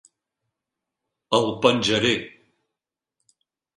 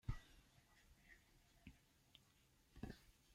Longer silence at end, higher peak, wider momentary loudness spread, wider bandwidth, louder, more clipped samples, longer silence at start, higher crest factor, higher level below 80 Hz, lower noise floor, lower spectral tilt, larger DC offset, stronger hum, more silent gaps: first, 1.5 s vs 0 s; first, -4 dBFS vs -34 dBFS; second, 8 LU vs 12 LU; second, 11 kHz vs 16 kHz; first, -21 LUFS vs -61 LUFS; neither; first, 1.3 s vs 0.05 s; about the same, 24 dB vs 26 dB; about the same, -60 dBFS vs -64 dBFS; first, -87 dBFS vs -76 dBFS; second, -4 dB/octave vs -6 dB/octave; neither; neither; neither